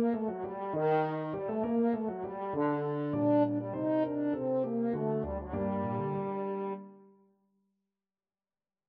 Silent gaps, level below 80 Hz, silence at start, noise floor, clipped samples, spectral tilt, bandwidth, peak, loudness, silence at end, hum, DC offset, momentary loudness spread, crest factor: none; -58 dBFS; 0 s; under -90 dBFS; under 0.1%; -8 dB/octave; 4.8 kHz; -18 dBFS; -32 LUFS; 1.9 s; none; under 0.1%; 7 LU; 14 dB